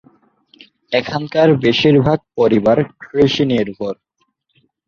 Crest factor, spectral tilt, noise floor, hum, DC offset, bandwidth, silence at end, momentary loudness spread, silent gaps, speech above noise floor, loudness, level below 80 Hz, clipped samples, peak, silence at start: 14 dB; -7 dB/octave; -66 dBFS; none; under 0.1%; 7 kHz; 0.95 s; 10 LU; none; 52 dB; -15 LUFS; -48 dBFS; under 0.1%; -2 dBFS; 0.9 s